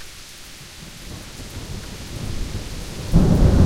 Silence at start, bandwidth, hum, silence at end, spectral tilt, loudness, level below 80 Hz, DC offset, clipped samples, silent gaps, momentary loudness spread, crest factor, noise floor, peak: 0 s; 16.5 kHz; none; 0 s; -6.5 dB/octave; -24 LUFS; -26 dBFS; under 0.1%; under 0.1%; none; 21 LU; 18 dB; -39 dBFS; -2 dBFS